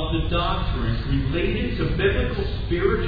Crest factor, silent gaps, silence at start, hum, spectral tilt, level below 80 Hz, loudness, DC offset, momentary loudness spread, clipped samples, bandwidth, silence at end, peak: 16 dB; none; 0 s; none; -9 dB/octave; -28 dBFS; -24 LUFS; under 0.1%; 4 LU; under 0.1%; 5 kHz; 0 s; -8 dBFS